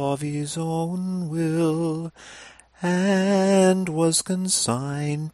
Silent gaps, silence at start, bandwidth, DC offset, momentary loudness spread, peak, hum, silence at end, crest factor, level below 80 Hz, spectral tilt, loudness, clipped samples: none; 0 s; 15.5 kHz; under 0.1%; 10 LU; -8 dBFS; none; 0.05 s; 16 dB; -62 dBFS; -5 dB/octave; -23 LUFS; under 0.1%